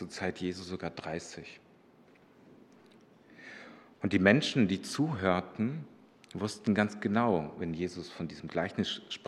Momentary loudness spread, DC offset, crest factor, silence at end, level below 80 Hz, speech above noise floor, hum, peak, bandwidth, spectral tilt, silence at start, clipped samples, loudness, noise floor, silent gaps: 21 LU; under 0.1%; 24 dB; 0 s; -70 dBFS; 29 dB; none; -8 dBFS; 12 kHz; -5.5 dB/octave; 0 s; under 0.1%; -32 LUFS; -61 dBFS; none